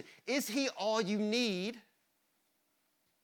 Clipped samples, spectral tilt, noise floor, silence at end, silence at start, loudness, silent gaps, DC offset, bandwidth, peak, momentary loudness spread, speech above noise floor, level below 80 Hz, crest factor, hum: under 0.1%; -3.5 dB/octave; -78 dBFS; 1.45 s; 0 s; -34 LUFS; none; under 0.1%; 19.5 kHz; -20 dBFS; 5 LU; 44 dB; -88 dBFS; 16 dB; none